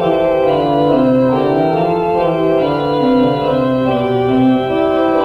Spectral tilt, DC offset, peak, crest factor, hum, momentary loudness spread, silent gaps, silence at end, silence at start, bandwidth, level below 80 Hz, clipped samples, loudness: -8.5 dB/octave; under 0.1%; -2 dBFS; 12 dB; none; 3 LU; none; 0 s; 0 s; 5.6 kHz; -42 dBFS; under 0.1%; -14 LUFS